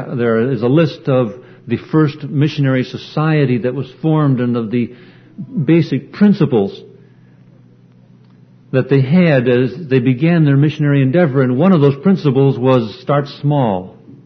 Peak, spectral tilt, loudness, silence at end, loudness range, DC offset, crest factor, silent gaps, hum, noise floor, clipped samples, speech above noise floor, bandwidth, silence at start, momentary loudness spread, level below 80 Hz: 0 dBFS; -9.5 dB/octave; -14 LUFS; 0.15 s; 5 LU; under 0.1%; 14 dB; none; none; -45 dBFS; under 0.1%; 32 dB; 6.2 kHz; 0 s; 9 LU; -56 dBFS